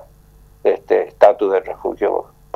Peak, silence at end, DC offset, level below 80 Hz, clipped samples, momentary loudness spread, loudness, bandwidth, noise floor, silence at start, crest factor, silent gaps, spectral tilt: 0 dBFS; 0.35 s; under 0.1%; -50 dBFS; under 0.1%; 9 LU; -17 LUFS; 12.5 kHz; -47 dBFS; 0.65 s; 18 dB; none; -6 dB/octave